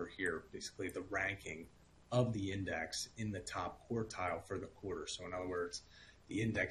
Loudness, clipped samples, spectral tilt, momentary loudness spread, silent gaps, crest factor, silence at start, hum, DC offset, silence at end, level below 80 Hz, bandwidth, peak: -42 LUFS; under 0.1%; -4.5 dB/octave; 11 LU; none; 22 dB; 0 s; none; under 0.1%; 0 s; -64 dBFS; 12.5 kHz; -20 dBFS